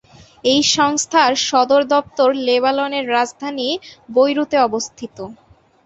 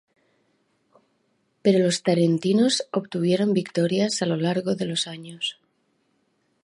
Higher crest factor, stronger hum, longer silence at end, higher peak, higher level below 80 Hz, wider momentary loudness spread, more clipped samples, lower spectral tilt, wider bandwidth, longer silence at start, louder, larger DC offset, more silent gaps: about the same, 16 dB vs 18 dB; neither; second, 0.5 s vs 1.1 s; first, -2 dBFS vs -6 dBFS; first, -58 dBFS vs -72 dBFS; first, 12 LU vs 9 LU; neither; second, -2 dB/octave vs -5 dB/octave; second, 8.2 kHz vs 11.5 kHz; second, 0.45 s vs 1.65 s; first, -16 LUFS vs -23 LUFS; neither; neither